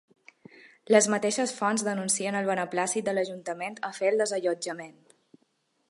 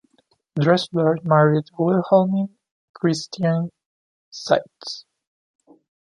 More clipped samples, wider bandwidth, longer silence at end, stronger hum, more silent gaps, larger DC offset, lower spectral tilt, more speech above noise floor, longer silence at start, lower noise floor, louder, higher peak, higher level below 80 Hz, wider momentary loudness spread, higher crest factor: neither; about the same, 11.5 kHz vs 11 kHz; about the same, 1 s vs 1.05 s; neither; second, none vs 2.71-2.94 s, 3.86-4.32 s; neither; second, -3 dB/octave vs -6.5 dB/octave; about the same, 45 dB vs 45 dB; about the same, 0.65 s vs 0.55 s; first, -72 dBFS vs -64 dBFS; second, -27 LUFS vs -20 LUFS; second, -6 dBFS vs -2 dBFS; second, -80 dBFS vs -66 dBFS; second, 12 LU vs 16 LU; about the same, 22 dB vs 20 dB